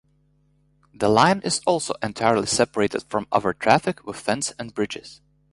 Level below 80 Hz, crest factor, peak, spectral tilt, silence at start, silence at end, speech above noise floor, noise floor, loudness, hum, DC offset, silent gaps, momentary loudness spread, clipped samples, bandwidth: -56 dBFS; 22 dB; -2 dBFS; -4 dB/octave; 1 s; 0.4 s; 41 dB; -63 dBFS; -22 LUFS; 50 Hz at -50 dBFS; under 0.1%; none; 11 LU; under 0.1%; 11.5 kHz